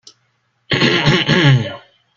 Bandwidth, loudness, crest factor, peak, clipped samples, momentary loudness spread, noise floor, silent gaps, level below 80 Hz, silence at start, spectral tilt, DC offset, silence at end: 7.4 kHz; -13 LUFS; 16 dB; 0 dBFS; under 0.1%; 8 LU; -64 dBFS; none; -46 dBFS; 0.7 s; -5.5 dB/octave; under 0.1%; 0.4 s